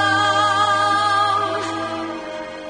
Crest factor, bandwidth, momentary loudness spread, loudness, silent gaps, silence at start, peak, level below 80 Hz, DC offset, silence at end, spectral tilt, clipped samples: 14 dB; 10 kHz; 12 LU; -18 LUFS; none; 0 s; -6 dBFS; -60 dBFS; under 0.1%; 0 s; -3 dB/octave; under 0.1%